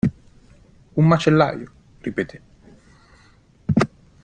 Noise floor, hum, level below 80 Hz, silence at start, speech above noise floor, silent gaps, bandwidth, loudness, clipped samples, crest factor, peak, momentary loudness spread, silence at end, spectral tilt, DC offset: -53 dBFS; none; -50 dBFS; 0.05 s; 35 dB; none; 9 kHz; -21 LUFS; under 0.1%; 22 dB; 0 dBFS; 17 LU; 0.4 s; -7.5 dB/octave; under 0.1%